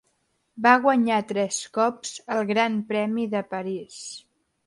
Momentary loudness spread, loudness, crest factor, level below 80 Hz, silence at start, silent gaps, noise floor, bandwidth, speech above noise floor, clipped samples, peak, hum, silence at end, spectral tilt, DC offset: 17 LU; -24 LUFS; 22 dB; -72 dBFS; 0.55 s; none; -71 dBFS; 11.5 kHz; 47 dB; under 0.1%; -4 dBFS; none; 0.5 s; -4 dB/octave; under 0.1%